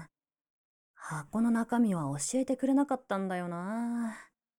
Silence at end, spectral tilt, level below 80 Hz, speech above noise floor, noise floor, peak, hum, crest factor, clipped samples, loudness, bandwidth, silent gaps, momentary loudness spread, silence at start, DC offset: 0.35 s; -5.5 dB/octave; -70 dBFS; 24 dB; -55 dBFS; -18 dBFS; none; 14 dB; under 0.1%; -32 LUFS; 16.5 kHz; 0.50-0.94 s; 12 LU; 0 s; under 0.1%